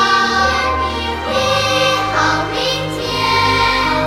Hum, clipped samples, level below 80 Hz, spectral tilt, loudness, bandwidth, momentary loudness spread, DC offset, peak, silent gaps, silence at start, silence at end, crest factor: none; under 0.1%; -34 dBFS; -3.5 dB/octave; -15 LUFS; 16.5 kHz; 6 LU; under 0.1%; -2 dBFS; none; 0 s; 0 s; 14 dB